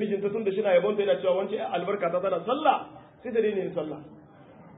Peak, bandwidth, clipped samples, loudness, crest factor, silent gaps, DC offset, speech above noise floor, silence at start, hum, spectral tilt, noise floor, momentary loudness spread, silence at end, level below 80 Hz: -10 dBFS; 4 kHz; under 0.1%; -27 LUFS; 18 dB; none; under 0.1%; 24 dB; 0 s; none; -10 dB/octave; -51 dBFS; 11 LU; 0 s; -72 dBFS